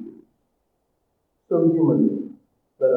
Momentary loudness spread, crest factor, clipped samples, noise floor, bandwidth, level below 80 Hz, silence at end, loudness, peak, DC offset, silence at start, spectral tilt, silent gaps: 18 LU; 16 dB; under 0.1%; -72 dBFS; 2.1 kHz; -76 dBFS; 0 s; -21 LUFS; -8 dBFS; under 0.1%; 0 s; -13 dB/octave; none